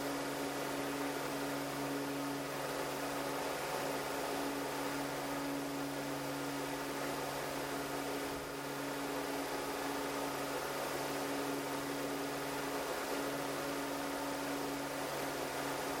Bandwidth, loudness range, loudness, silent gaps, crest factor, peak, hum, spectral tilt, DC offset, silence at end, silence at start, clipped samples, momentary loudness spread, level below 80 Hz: 16.5 kHz; 1 LU; -39 LUFS; none; 14 dB; -26 dBFS; none; -3.5 dB/octave; under 0.1%; 0 s; 0 s; under 0.1%; 1 LU; -66 dBFS